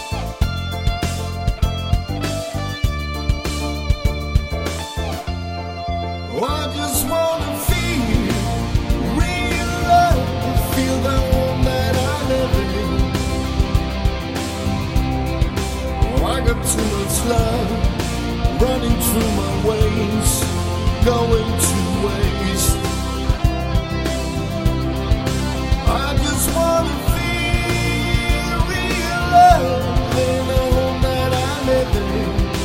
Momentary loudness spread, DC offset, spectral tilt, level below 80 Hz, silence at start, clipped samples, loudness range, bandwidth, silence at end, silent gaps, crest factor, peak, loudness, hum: 6 LU; under 0.1%; -5 dB/octave; -24 dBFS; 0 s; under 0.1%; 6 LU; 16.5 kHz; 0 s; none; 18 dB; 0 dBFS; -19 LUFS; none